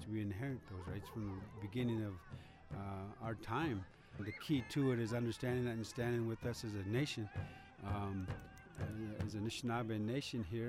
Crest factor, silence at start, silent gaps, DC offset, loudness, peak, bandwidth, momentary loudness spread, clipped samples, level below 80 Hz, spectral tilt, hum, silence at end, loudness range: 16 dB; 0 s; none; under 0.1%; -42 LUFS; -26 dBFS; 15.5 kHz; 10 LU; under 0.1%; -62 dBFS; -6.5 dB/octave; none; 0 s; 4 LU